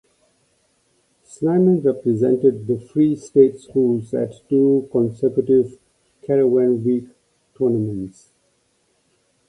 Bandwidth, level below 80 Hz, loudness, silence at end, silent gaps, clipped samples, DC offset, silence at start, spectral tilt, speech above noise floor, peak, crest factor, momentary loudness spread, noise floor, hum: 10.5 kHz; -60 dBFS; -19 LUFS; 1.4 s; none; under 0.1%; under 0.1%; 1.4 s; -9.5 dB/octave; 47 dB; -2 dBFS; 18 dB; 9 LU; -65 dBFS; none